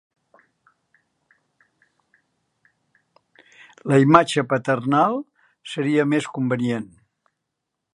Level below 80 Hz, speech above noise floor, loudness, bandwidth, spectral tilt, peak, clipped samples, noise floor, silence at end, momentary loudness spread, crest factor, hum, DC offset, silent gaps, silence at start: -66 dBFS; 61 dB; -20 LUFS; 11.5 kHz; -6.5 dB/octave; 0 dBFS; under 0.1%; -81 dBFS; 1.1 s; 20 LU; 24 dB; none; under 0.1%; none; 3.85 s